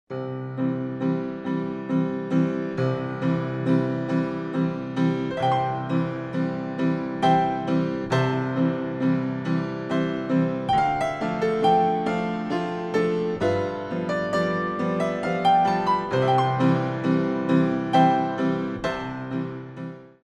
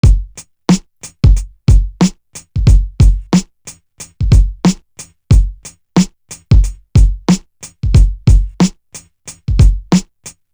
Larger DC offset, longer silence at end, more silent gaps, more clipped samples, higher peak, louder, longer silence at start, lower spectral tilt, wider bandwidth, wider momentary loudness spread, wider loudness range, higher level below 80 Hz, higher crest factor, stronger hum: neither; about the same, 0.15 s vs 0.25 s; neither; neither; second, -8 dBFS vs 0 dBFS; second, -24 LUFS vs -14 LUFS; about the same, 0.1 s vs 0.05 s; about the same, -7.5 dB/octave vs -6.5 dB/octave; second, 9.6 kHz vs 11 kHz; second, 8 LU vs 22 LU; about the same, 3 LU vs 1 LU; second, -56 dBFS vs -14 dBFS; about the same, 16 dB vs 12 dB; neither